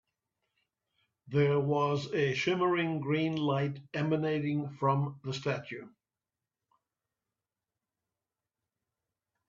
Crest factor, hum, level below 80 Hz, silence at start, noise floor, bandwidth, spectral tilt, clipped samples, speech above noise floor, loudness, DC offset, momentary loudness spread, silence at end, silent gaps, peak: 18 dB; none; -74 dBFS; 1.25 s; under -90 dBFS; 7.4 kHz; -7 dB/octave; under 0.1%; over 59 dB; -31 LUFS; under 0.1%; 7 LU; 3.6 s; none; -14 dBFS